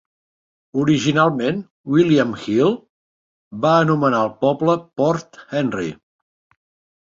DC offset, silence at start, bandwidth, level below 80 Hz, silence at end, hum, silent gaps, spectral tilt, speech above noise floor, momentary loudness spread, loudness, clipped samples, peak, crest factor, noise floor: under 0.1%; 0.75 s; 7.6 kHz; -58 dBFS; 1.1 s; none; 1.70-1.84 s, 2.90-3.51 s; -6.5 dB/octave; over 72 dB; 11 LU; -19 LUFS; under 0.1%; -2 dBFS; 18 dB; under -90 dBFS